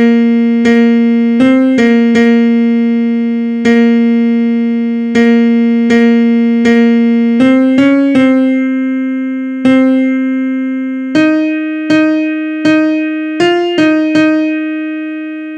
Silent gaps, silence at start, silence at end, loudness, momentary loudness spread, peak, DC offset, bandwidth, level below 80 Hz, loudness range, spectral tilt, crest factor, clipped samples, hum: none; 0 s; 0 s; -10 LUFS; 7 LU; 0 dBFS; under 0.1%; 8 kHz; -56 dBFS; 3 LU; -6 dB/octave; 10 dB; under 0.1%; none